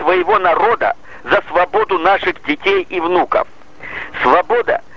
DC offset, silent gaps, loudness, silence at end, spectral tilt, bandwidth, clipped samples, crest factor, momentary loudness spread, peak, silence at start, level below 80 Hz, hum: 2%; none; -15 LUFS; 0.15 s; -5.5 dB/octave; 7.4 kHz; under 0.1%; 16 dB; 13 LU; 0 dBFS; 0 s; -48 dBFS; none